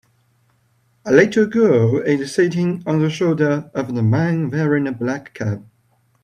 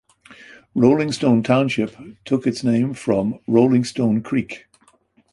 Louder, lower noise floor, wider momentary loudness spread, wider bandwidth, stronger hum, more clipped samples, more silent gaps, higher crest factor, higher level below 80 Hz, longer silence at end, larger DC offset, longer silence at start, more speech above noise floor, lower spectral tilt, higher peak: about the same, -18 LUFS vs -19 LUFS; about the same, -61 dBFS vs -58 dBFS; about the same, 11 LU vs 11 LU; about the same, 10.5 kHz vs 11.5 kHz; neither; neither; neither; about the same, 18 dB vs 18 dB; about the same, -58 dBFS vs -56 dBFS; second, 0.6 s vs 0.75 s; neither; first, 1.05 s vs 0.3 s; first, 44 dB vs 39 dB; about the same, -7.5 dB/octave vs -7 dB/octave; about the same, 0 dBFS vs -2 dBFS